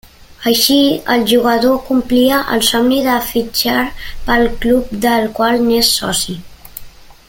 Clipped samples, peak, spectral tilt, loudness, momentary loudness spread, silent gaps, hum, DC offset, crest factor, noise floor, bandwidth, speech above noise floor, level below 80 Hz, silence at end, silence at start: under 0.1%; 0 dBFS; -3 dB/octave; -13 LUFS; 11 LU; none; none; under 0.1%; 14 dB; -35 dBFS; 17 kHz; 21 dB; -34 dBFS; 0.15 s; 0.3 s